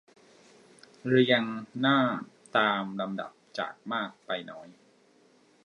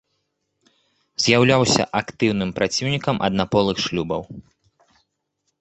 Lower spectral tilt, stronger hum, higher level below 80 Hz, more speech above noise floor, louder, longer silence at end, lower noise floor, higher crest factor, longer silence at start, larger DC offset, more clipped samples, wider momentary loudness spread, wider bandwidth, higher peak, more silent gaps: first, -6.5 dB/octave vs -4.5 dB/octave; neither; second, -78 dBFS vs -50 dBFS; second, 34 dB vs 54 dB; second, -29 LUFS vs -20 LUFS; second, 0.95 s vs 1.2 s; second, -62 dBFS vs -74 dBFS; about the same, 22 dB vs 22 dB; second, 1.05 s vs 1.2 s; neither; neither; first, 14 LU vs 11 LU; first, 10 kHz vs 8.4 kHz; second, -8 dBFS vs -2 dBFS; neither